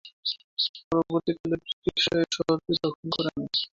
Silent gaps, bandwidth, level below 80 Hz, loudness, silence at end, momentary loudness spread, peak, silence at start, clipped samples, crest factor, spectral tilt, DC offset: 0.13-0.23 s, 0.44-0.57 s, 0.69-0.74 s, 0.84-0.91 s, 1.40-1.44 s, 1.73-1.82 s, 2.95-3.03 s; 7.6 kHz; -58 dBFS; -27 LUFS; 0.15 s; 6 LU; -10 dBFS; 0.05 s; under 0.1%; 18 dB; -4.5 dB/octave; under 0.1%